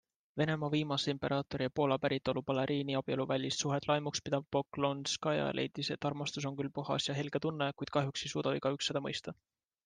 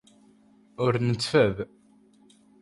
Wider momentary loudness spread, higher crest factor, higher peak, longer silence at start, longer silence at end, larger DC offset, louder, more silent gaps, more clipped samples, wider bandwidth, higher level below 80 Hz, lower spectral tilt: second, 5 LU vs 13 LU; about the same, 20 dB vs 20 dB; second, -16 dBFS vs -8 dBFS; second, 0.35 s vs 0.8 s; second, 0.5 s vs 0.95 s; neither; second, -35 LUFS vs -25 LUFS; neither; neither; second, 10 kHz vs 11.5 kHz; second, -68 dBFS vs -58 dBFS; about the same, -5 dB/octave vs -6 dB/octave